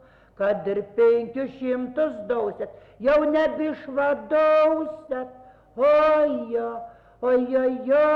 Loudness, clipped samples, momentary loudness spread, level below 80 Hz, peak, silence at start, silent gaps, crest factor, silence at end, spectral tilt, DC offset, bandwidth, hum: -23 LUFS; under 0.1%; 14 LU; -56 dBFS; -10 dBFS; 0.4 s; none; 12 dB; 0 s; -7 dB/octave; under 0.1%; 5.8 kHz; none